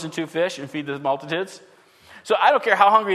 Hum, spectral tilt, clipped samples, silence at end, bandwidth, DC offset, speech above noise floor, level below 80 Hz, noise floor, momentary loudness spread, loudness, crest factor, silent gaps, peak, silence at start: none; -4 dB/octave; under 0.1%; 0 s; 13.5 kHz; under 0.1%; 28 dB; -74 dBFS; -49 dBFS; 14 LU; -21 LUFS; 20 dB; none; -2 dBFS; 0 s